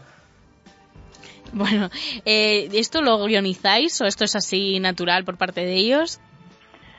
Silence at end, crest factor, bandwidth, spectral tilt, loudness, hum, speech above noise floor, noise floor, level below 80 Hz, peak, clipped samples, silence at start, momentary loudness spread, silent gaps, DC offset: 0.85 s; 20 dB; 8 kHz; -3 dB/octave; -20 LUFS; none; 33 dB; -54 dBFS; -56 dBFS; -2 dBFS; under 0.1%; 1 s; 8 LU; none; under 0.1%